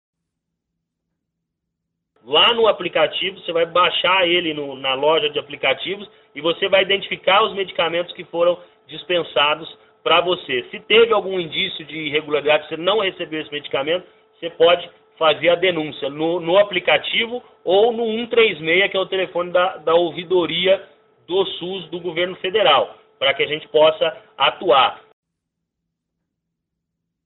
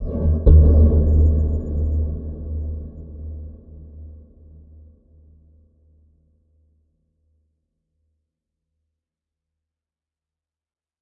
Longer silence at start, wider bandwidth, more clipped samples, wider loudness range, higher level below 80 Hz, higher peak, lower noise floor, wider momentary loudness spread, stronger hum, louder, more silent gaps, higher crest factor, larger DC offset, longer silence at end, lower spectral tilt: first, 2.25 s vs 0 s; first, 4.1 kHz vs 1.2 kHz; neither; second, 3 LU vs 24 LU; second, -62 dBFS vs -24 dBFS; second, -4 dBFS vs 0 dBFS; second, -79 dBFS vs under -90 dBFS; second, 11 LU vs 25 LU; neither; about the same, -18 LUFS vs -18 LUFS; neither; about the same, 16 dB vs 20 dB; neither; second, 2.25 s vs 6.85 s; second, -0.5 dB/octave vs -13.5 dB/octave